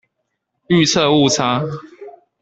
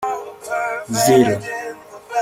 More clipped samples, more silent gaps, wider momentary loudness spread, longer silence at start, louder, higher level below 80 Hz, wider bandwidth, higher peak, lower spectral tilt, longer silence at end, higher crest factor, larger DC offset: neither; neither; second, 12 LU vs 16 LU; first, 0.7 s vs 0 s; first, -15 LUFS vs -19 LUFS; about the same, -54 dBFS vs -56 dBFS; second, 8.4 kHz vs 16.5 kHz; about the same, -2 dBFS vs -2 dBFS; about the same, -4.5 dB/octave vs -4.5 dB/octave; first, 0.3 s vs 0 s; about the same, 16 dB vs 18 dB; neither